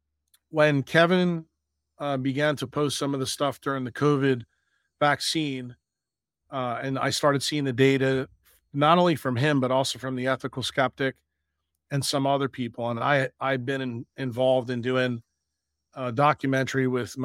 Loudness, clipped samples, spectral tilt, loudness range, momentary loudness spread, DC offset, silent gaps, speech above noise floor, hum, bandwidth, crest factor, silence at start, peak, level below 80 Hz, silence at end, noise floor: -25 LUFS; under 0.1%; -5 dB/octave; 4 LU; 11 LU; under 0.1%; none; 64 dB; none; 16 kHz; 22 dB; 0.55 s; -4 dBFS; -66 dBFS; 0 s; -89 dBFS